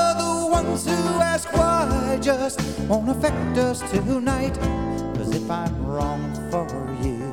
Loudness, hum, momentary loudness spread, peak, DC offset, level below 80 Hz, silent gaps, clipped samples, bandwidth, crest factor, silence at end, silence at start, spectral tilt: -23 LUFS; none; 6 LU; -6 dBFS; 0.3%; -34 dBFS; none; under 0.1%; 17.5 kHz; 16 dB; 0 s; 0 s; -5.5 dB/octave